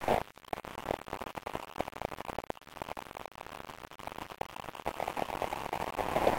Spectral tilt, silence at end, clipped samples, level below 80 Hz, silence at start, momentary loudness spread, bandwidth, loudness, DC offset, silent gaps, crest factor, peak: -4.5 dB/octave; 0 s; under 0.1%; -56 dBFS; 0 s; 12 LU; 17 kHz; -39 LUFS; under 0.1%; none; 22 dB; -14 dBFS